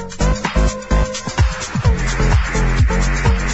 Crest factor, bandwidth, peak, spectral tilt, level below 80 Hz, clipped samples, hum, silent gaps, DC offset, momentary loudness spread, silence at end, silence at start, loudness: 12 dB; 8.2 kHz; -4 dBFS; -5 dB/octave; -18 dBFS; under 0.1%; none; none; under 0.1%; 3 LU; 0 s; 0 s; -18 LUFS